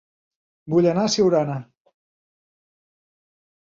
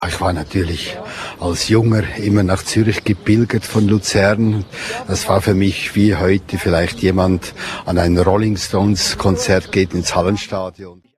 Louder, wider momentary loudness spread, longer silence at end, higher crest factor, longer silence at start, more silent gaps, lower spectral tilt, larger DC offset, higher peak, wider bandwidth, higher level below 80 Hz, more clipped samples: second, -20 LUFS vs -16 LUFS; about the same, 9 LU vs 10 LU; first, 2.05 s vs 0.25 s; about the same, 18 dB vs 16 dB; first, 0.65 s vs 0 s; neither; about the same, -5.5 dB/octave vs -5.5 dB/octave; neither; second, -6 dBFS vs 0 dBFS; second, 7.8 kHz vs 14 kHz; second, -62 dBFS vs -36 dBFS; neither